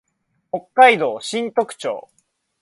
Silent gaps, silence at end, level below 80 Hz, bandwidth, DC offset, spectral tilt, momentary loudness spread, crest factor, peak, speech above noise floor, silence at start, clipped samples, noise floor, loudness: none; 0.6 s; -72 dBFS; 11.5 kHz; under 0.1%; -3 dB/octave; 17 LU; 20 dB; 0 dBFS; 53 dB; 0.55 s; under 0.1%; -70 dBFS; -17 LUFS